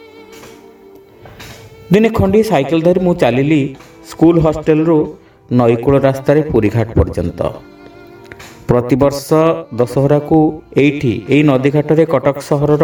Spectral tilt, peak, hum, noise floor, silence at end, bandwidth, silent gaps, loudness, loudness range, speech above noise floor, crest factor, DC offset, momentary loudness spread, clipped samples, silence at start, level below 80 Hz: -7.5 dB/octave; 0 dBFS; none; -40 dBFS; 0 s; 19.5 kHz; none; -13 LUFS; 3 LU; 28 dB; 14 dB; under 0.1%; 10 LU; under 0.1%; 0.2 s; -34 dBFS